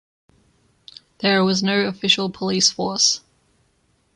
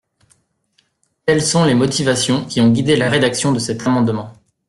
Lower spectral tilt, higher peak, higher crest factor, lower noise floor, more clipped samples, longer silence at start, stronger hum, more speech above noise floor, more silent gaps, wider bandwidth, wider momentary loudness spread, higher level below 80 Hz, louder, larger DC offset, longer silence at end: second, -3 dB/octave vs -4.5 dB/octave; about the same, -4 dBFS vs -2 dBFS; first, 20 dB vs 14 dB; about the same, -64 dBFS vs -63 dBFS; neither; about the same, 1.2 s vs 1.25 s; neither; second, 44 dB vs 48 dB; neither; second, 11 kHz vs 12.5 kHz; about the same, 5 LU vs 6 LU; second, -62 dBFS vs -50 dBFS; about the same, -18 LUFS vs -16 LUFS; neither; first, 0.95 s vs 0.35 s